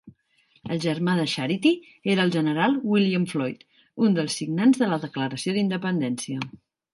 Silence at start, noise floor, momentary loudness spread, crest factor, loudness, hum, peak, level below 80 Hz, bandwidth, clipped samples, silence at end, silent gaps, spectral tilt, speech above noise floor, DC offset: 0.05 s; -64 dBFS; 10 LU; 16 dB; -24 LUFS; none; -8 dBFS; -68 dBFS; 11.5 kHz; under 0.1%; 0.35 s; none; -5.5 dB/octave; 41 dB; under 0.1%